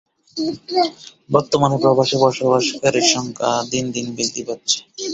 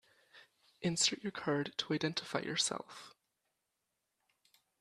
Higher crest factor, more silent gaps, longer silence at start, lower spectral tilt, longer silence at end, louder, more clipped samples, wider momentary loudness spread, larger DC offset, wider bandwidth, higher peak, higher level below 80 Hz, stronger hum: about the same, 18 dB vs 22 dB; neither; about the same, 0.35 s vs 0.35 s; about the same, -3.5 dB/octave vs -3 dB/octave; second, 0 s vs 1.7 s; first, -18 LUFS vs -36 LUFS; neither; about the same, 9 LU vs 11 LU; neither; second, 8.2 kHz vs 13.5 kHz; first, -2 dBFS vs -18 dBFS; first, -58 dBFS vs -78 dBFS; neither